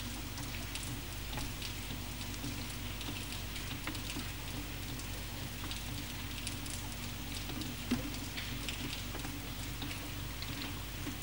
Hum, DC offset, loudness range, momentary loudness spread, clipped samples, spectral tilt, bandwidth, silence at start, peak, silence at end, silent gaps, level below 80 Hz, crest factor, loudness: 50 Hz at -45 dBFS; 0.2%; 1 LU; 2 LU; under 0.1%; -3.5 dB/octave; 19.5 kHz; 0 s; -20 dBFS; 0 s; none; -48 dBFS; 22 dB; -40 LUFS